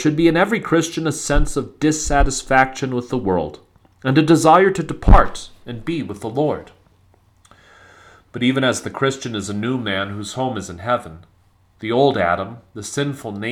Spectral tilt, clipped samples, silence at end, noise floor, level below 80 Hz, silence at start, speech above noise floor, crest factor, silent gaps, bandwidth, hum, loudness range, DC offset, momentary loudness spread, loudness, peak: -5 dB/octave; under 0.1%; 0 s; -56 dBFS; -26 dBFS; 0 s; 38 dB; 18 dB; none; 14 kHz; none; 7 LU; under 0.1%; 13 LU; -19 LUFS; 0 dBFS